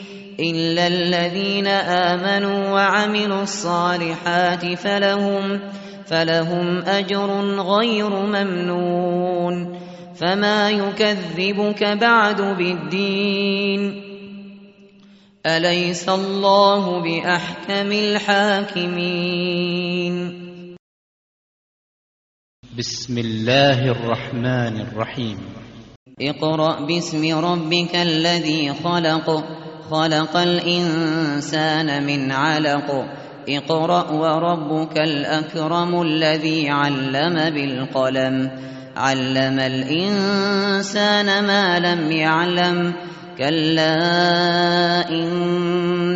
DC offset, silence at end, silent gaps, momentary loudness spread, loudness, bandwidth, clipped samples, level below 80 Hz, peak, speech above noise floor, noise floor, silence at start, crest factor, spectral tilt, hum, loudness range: under 0.1%; 0 s; 20.79-22.63 s, 25.96-26.06 s; 9 LU; -19 LUFS; 8 kHz; under 0.1%; -60 dBFS; 0 dBFS; 30 dB; -49 dBFS; 0 s; 18 dB; -3.5 dB/octave; none; 4 LU